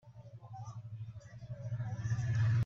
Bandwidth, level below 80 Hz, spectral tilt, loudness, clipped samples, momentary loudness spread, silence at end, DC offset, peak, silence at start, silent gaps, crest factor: 7 kHz; -60 dBFS; -7 dB/octave; -39 LUFS; under 0.1%; 18 LU; 0 s; under 0.1%; -24 dBFS; 0.05 s; none; 14 dB